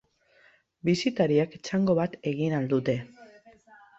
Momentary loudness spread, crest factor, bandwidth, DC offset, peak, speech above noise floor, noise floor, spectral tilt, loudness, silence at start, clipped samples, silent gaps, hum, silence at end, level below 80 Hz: 7 LU; 18 dB; 8 kHz; under 0.1%; -10 dBFS; 36 dB; -62 dBFS; -6.5 dB/octave; -27 LUFS; 0.85 s; under 0.1%; none; none; 0.75 s; -64 dBFS